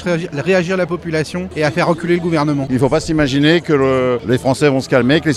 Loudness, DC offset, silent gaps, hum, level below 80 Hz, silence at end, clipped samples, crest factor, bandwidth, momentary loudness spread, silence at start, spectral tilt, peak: -15 LUFS; under 0.1%; none; none; -40 dBFS; 0 s; under 0.1%; 14 dB; 13.5 kHz; 6 LU; 0 s; -6 dB/octave; 0 dBFS